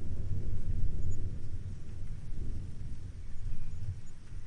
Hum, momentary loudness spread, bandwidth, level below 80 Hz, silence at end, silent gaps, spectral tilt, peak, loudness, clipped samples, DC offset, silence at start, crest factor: none; 8 LU; 6.6 kHz; -38 dBFS; 0 s; none; -7.5 dB/octave; -16 dBFS; -42 LUFS; under 0.1%; under 0.1%; 0 s; 14 dB